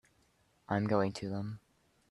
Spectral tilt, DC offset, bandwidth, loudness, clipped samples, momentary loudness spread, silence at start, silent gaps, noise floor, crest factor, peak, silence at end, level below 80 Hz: -7 dB/octave; under 0.1%; 11 kHz; -35 LUFS; under 0.1%; 13 LU; 0.7 s; none; -71 dBFS; 22 dB; -16 dBFS; 0.5 s; -70 dBFS